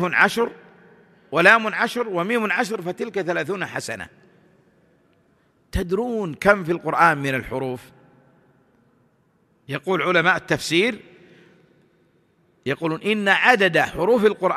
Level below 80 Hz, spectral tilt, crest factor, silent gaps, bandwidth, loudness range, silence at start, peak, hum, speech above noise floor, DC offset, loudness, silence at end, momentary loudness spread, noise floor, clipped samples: -46 dBFS; -4.5 dB/octave; 22 dB; none; 14 kHz; 6 LU; 0 s; 0 dBFS; none; 42 dB; under 0.1%; -20 LUFS; 0 s; 14 LU; -62 dBFS; under 0.1%